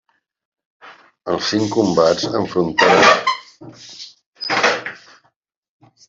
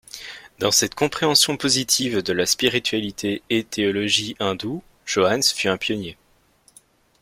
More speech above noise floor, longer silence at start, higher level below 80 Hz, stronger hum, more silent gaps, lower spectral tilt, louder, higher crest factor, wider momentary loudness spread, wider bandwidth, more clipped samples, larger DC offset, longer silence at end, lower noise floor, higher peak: first, 48 dB vs 37 dB; first, 0.85 s vs 0.15 s; about the same, -58 dBFS vs -56 dBFS; neither; first, 4.26-4.33 s vs none; first, -4 dB/octave vs -2.5 dB/octave; first, -16 LUFS vs -20 LUFS; about the same, 18 dB vs 20 dB; first, 24 LU vs 12 LU; second, 8 kHz vs 16.5 kHz; neither; neither; about the same, 1.1 s vs 1.1 s; first, -64 dBFS vs -58 dBFS; about the same, 0 dBFS vs -2 dBFS